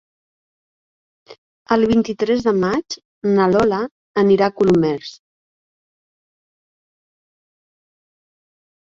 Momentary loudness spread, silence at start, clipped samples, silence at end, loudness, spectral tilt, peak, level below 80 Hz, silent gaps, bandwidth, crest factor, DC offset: 9 LU; 1.3 s; under 0.1%; 3.7 s; -17 LUFS; -6.5 dB/octave; -2 dBFS; -52 dBFS; 1.38-1.66 s, 3.05-3.22 s, 3.91-4.14 s; 7.6 kHz; 18 dB; under 0.1%